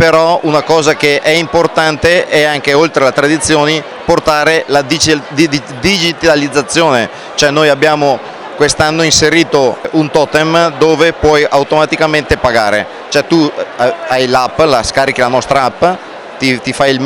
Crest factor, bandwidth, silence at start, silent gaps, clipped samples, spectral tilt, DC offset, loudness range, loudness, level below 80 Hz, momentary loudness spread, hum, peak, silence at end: 10 dB; 19 kHz; 0 s; none; under 0.1%; -3.5 dB/octave; under 0.1%; 2 LU; -10 LUFS; -36 dBFS; 5 LU; none; 0 dBFS; 0 s